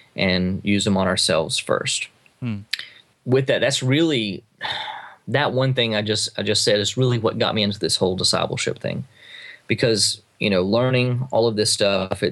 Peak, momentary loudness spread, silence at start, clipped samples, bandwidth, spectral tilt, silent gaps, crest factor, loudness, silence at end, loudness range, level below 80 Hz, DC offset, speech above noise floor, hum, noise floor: -4 dBFS; 12 LU; 0.15 s; under 0.1%; 12.5 kHz; -4 dB/octave; none; 16 dB; -20 LUFS; 0 s; 2 LU; -58 dBFS; under 0.1%; 21 dB; none; -42 dBFS